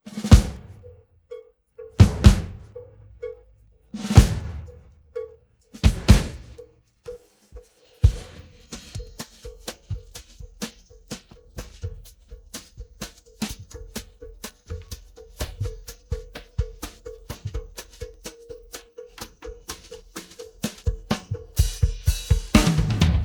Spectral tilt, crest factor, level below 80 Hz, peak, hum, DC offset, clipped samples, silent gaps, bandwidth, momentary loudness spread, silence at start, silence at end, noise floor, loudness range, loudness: -6 dB/octave; 24 dB; -28 dBFS; 0 dBFS; none; under 0.1%; under 0.1%; none; 19.5 kHz; 25 LU; 0.05 s; 0 s; -55 dBFS; 17 LU; -23 LUFS